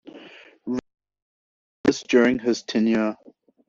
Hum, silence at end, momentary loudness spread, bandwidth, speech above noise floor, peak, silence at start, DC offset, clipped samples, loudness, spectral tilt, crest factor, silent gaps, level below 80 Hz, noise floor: none; 0.55 s; 19 LU; 7.6 kHz; 27 dB; -4 dBFS; 0.05 s; under 0.1%; under 0.1%; -23 LUFS; -4 dB/octave; 20 dB; 1.22-1.84 s; -60 dBFS; -47 dBFS